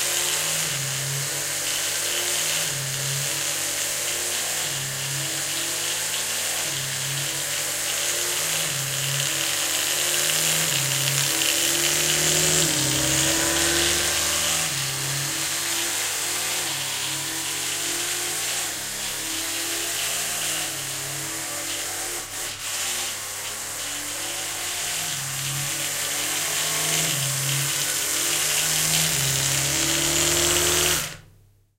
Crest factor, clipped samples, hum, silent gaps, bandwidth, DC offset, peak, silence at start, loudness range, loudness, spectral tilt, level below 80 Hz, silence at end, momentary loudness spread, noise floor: 22 dB; under 0.1%; none; none; 16 kHz; under 0.1%; -4 dBFS; 0 s; 7 LU; -22 LUFS; -1 dB/octave; -50 dBFS; 0.55 s; 8 LU; -55 dBFS